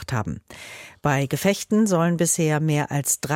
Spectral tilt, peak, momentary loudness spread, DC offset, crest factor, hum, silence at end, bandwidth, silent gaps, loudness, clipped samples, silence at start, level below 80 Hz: -5 dB/octave; -6 dBFS; 16 LU; under 0.1%; 16 dB; none; 0 s; 17 kHz; none; -22 LUFS; under 0.1%; 0 s; -52 dBFS